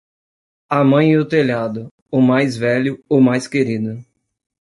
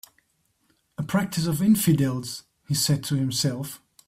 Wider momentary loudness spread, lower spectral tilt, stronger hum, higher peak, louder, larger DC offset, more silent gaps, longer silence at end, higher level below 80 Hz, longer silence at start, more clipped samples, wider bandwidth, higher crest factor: second, 11 LU vs 15 LU; first, -7 dB/octave vs -5 dB/octave; neither; first, -2 dBFS vs -10 dBFS; first, -16 LUFS vs -24 LUFS; neither; first, 1.91-2.06 s vs none; first, 0.6 s vs 0.3 s; about the same, -58 dBFS vs -58 dBFS; second, 0.7 s vs 1 s; neither; second, 11.5 kHz vs 16 kHz; about the same, 14 dB vs 16 dB